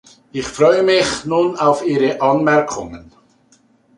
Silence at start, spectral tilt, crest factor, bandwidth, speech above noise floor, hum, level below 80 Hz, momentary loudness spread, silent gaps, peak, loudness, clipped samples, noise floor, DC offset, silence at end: 0.35 s; -4.5 dB/octave; 16 dB; 11.5 kHz; 39 dB; none; -50 dBFS; 13 LU; none; -2 dBFS; -16 LUFS; under 0.1%; -55 dBFS; under 0.1%; 0.95 s